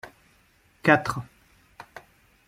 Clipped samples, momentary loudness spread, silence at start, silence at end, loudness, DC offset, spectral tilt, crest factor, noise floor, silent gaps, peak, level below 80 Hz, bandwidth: under 0.1%; 26 LU; 0.05 s; 0.5 s; -24 LUFS; under 0.1%; -6 dB/octave; 26 dB; -62 dBFS; none; -4 dBFS; -60 dBFS; 15.5 kHz